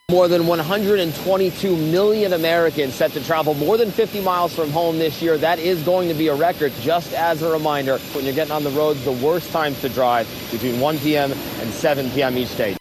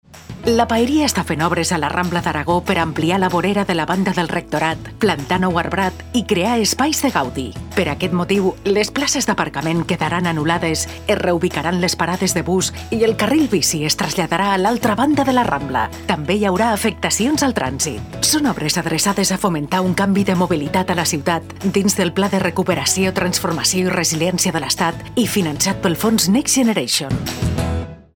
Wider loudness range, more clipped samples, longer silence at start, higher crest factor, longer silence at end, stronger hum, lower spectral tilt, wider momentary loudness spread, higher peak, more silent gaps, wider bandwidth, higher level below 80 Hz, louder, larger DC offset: about the same, 2 LU vs 2 LU; neither; about the same, 0.1 s vs 0.15 s; about the same, 16 dB vs 18 dB; second, 0 s vs 0.2 s; neither; first, -5.5 dB/octave vs -4 dB/octave; about the same, 5 LU vs 5 LU; second, -4 dBFS vs 0 dBFS; neither; second, 14.5 kHz vs 19.5 kHz; second, -50 dBFS vs -40 dBFS; about the same, -19 LUFS vs -18 LUFS; neither